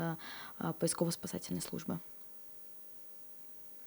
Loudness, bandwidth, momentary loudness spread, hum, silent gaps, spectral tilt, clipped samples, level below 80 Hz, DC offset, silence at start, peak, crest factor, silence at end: -40 LUFS; over 20 kHz; 11 LU; none; none; -4.5 dB/octave; under 0.1%; -74 dBFS; under 0.1%; 0 s; -20 dBFS; 22 dB; 0 s